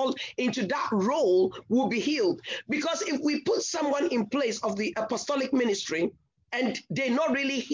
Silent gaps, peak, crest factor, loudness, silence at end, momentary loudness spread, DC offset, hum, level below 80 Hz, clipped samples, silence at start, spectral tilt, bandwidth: none; -14 dBFS; 12 dB; -28 LUFS; 0 s; 5 LU; under 0.1%; none; -70 dBFS; under 0.1%; 0 s; -4 dB/octave; 7.6 kHz